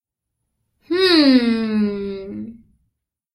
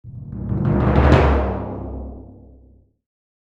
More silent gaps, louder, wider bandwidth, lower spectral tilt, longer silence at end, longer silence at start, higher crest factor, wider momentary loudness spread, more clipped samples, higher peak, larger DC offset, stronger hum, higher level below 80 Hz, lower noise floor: neither; about the same, -16 LUFS vs -18 LUFS; first, 12.5 kHz vs 7.2 kHz; second, -5.5 dB/octave vs -9 dB/octave; second, 0.8 s vs 1.2 s; first, 0.9 s vs 0.05 s; about the same, 18 dB vs 20 dB; about the same, 20 LU vs 20 LU; neither; about the same, -2 dBFS vs 0 dBFS; neither; neither; second, -54 dBFS vs -26 dBFS; first, -78 dBFS vs -51 dBFS